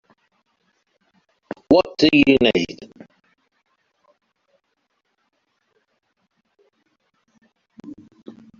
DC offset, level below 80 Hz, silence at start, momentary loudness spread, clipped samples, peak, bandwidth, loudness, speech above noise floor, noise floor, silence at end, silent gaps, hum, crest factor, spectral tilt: under 0.1%; -54 dBFS; 1.7 s; 29 LU; under 0.1%; 0 dBFS; 7.2 kHz; -16 LUFS; 56 dB; -72 dBFS; 0.7 s; none; none; 24 dB; -3 dB/octave